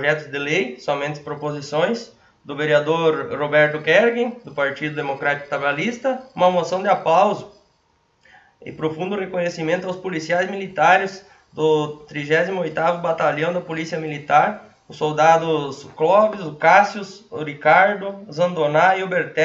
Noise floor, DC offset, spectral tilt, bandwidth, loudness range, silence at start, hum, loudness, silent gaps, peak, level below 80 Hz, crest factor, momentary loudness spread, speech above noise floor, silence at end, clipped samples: -63 dBFS; under 0.1%; -5 dB/octave; 7.8 kHz; 4 LU; 0 s; none; -20 LUFS; none; 0 dBFS; -64 dBFS; 20 dB; 12 LU; 43 dB; 0 s; under 0.1%